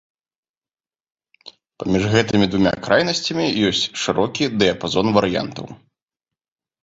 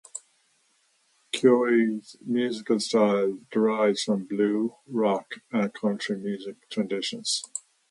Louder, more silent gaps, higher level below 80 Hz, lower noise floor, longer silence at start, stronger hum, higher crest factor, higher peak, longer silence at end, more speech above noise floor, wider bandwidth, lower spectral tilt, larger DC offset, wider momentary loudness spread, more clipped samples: first, -19 LUFS vs -26 LUFS; neither; first, -48 dBFS vs -76 dBFS; first, under -90 dBFS vs -68 dBFS; first, 1.45 s vs 0.15 s; neither; about the same, 20 dB vs 20 dB; first, -2 dBFS vs -6 dBFS; first, 1.05 s vs 0.3 s; first, over 71 dB vs 42 dB; second, 8 kHz vs 11.5 kHz; about the same, -5 dB/octave vs -4.5 dB/octave; neither; second, 8 LU vs 12 LU; neither